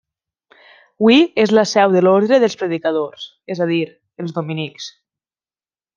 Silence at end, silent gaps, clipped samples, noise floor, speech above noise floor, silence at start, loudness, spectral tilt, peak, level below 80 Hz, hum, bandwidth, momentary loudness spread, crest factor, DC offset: 1.1 s; none; under 0.1%; under -90 dBFS; over 75 dB; 1 s; -16 LUFS; -5.5 dB/octave; -2 dBFS; -64 dBFS; none; 7.4 kHz; 16 LU; 16 dB; under 0.1%